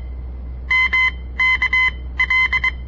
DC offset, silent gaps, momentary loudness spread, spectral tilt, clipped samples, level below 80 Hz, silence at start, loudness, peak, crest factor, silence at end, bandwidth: 0.1%; none; 18 LU; -3 dB/octave; under 0.1%; -30 dBFS; 0 s; -16 LUFS; -8 dBFS; 10 dB; 0 s; 7.6 kHz